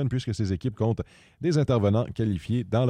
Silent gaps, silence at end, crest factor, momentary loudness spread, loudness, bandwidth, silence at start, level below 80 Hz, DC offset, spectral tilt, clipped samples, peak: none; 0 s; 14 dB; 7 LU; -27 LUFS; 9.8 kHz; 0 s; -50 dBFS; under 0.1%; -8 dB/octave; under 0.1%; -10 dBFS